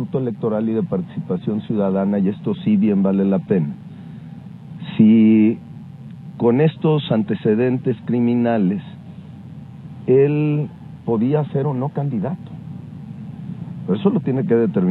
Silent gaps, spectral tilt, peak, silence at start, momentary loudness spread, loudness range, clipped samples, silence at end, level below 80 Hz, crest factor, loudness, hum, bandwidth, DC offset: none; -11 dB/octave; 0 dBFS; 0 s; 21 LU; 5 LU; under 0.1%; 0 s; -60 dBFS; 18 dB; -19 LUFS; none; 4.2 kHz; under 0.1%